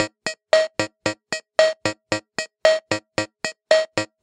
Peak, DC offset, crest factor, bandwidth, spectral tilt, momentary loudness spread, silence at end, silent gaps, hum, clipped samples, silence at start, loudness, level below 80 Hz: -2 dBFS; under 0.1%; 22 dB; 11 kHz; -3 dB/octave; 9 LU; 0.2 s; none; none; under 0.1%; 0 s; -22 LUFS; -60 dBFS